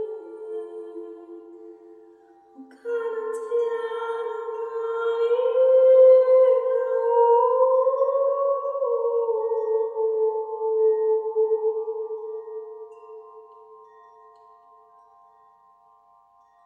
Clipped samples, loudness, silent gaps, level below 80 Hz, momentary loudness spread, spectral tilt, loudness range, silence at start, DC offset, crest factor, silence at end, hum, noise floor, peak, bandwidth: under 0.1%; -22 LUFS; none; -86 dBFS; 20 LU; -3.5 dB/octave; 16 LU; 0 s; under 0.1%; 16 dB; 2.9 s; none; -58 dBFS; -8 dBFS; 3.9 kHz